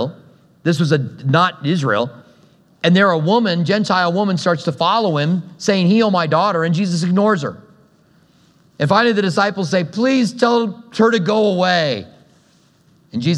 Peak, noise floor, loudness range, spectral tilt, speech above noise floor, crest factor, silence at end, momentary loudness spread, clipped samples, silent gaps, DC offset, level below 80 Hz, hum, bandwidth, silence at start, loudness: 0 dBFS; -54 dBFS; 2 LU; -6 dB/octave; 38 dB; 16 dB; 0 s; 7 LU; under 0.1%; none; under 0.1%; -66 dBFS; none; 11 kHz; 0 s; -16 LUFS